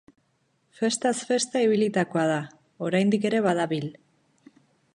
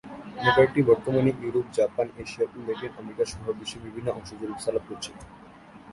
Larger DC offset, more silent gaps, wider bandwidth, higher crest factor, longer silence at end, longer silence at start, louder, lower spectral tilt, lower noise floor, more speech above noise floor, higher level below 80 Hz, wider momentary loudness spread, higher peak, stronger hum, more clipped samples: neither; neither; about the same, 11.5 kHz vs 11.5 kHz; about the same, 18 dB vs 20 dB; first, 1.05 s vs 0 s; first, 0.8 s vs 0.05 s; about the same, -25 LUFS vs -26 LUFS; about the same, -5 dB/octave vs -5.5 dB/octave; first, -70 dBFS vs -48 dBFS; first, 46 dB vs 22 dB; second, -74 dBFS vs -54 dBFS; second, 9 LU vs 17 LU; second, -10 dBFS vs -6 dBFS; neither; neither